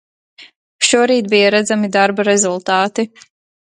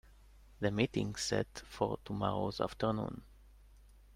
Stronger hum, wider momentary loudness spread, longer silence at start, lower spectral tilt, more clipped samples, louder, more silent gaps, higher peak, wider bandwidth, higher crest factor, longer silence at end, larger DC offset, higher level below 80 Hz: neither; about the same, 6 LU vs 7 LU; about the same, 0.4 s vs 0.35 s; second, -3 dB/octave vs -5 dB/octave; neither; first, -14 LUFS vs -37 LUFS; first, 0.56-0.79 s vs none; first, 0 dBFS vs -18 dBFS; second, 11.5 kHz vs 16 kHz; about the same, 16 dB vs 20 dB; first, 0.55 s vs 0.05 s; neither; second, -64 dBFS vs -58 dBFS